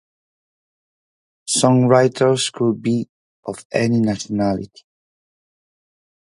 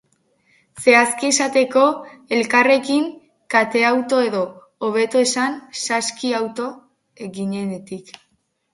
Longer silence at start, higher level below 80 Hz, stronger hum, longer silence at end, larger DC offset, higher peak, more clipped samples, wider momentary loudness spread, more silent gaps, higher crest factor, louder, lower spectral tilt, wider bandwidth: first, 1.45 s vs 0.75 s; first, -56 dBFS vs -68 dBFS; neither; first, 1.65 s vs 0.75 s; neither; about the same, 0 dBFS vs 0 dBFS; neither; first, 19 LU vs 14 LU; first, 3.09-3.43 s, 3.65-3.70 s vs none; about the same, 20 dB vs 20 dB; about the same, -18 LUFS vs -18 LUFS; first, -5 dB/octave vs -3 dB/octave; about the same, 11.5 kHz vs 11.5 kHz